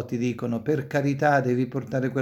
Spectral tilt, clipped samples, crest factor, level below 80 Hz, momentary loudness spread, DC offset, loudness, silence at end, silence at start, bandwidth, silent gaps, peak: -7.5 dB/octave; under 0.1%; 16 dB; -62 dBFS; 6 LU; under 0.1%; -25 LUFS; 0 s; 0 s; 15 kHz; none; -8 dBFS